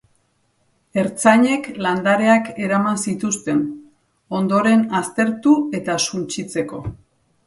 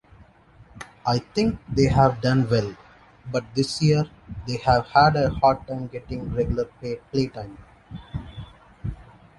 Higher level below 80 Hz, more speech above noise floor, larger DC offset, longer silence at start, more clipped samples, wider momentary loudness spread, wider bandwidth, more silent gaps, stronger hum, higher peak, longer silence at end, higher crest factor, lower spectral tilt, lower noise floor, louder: second, -54 dBFS vs -42 dBFS; first, 46 dB vs 30 dB; neither; first, 0.95 s vs 0.2 s; neither; second, 11 LU vs 20 LU; about the same, 11.5 kHz vs 11.5 kHz; neither; neither; first, 0 dBFS vs -4 dBFS; first, 0.5 s vs 0.35 s; about the same, 20 dB vs 20 dB; second, -4.5 dB/octave vs -6.5 dB/octave; first, -64 dBFS vs -52 dBFS; first, -19 LUFS vs -23 LUFS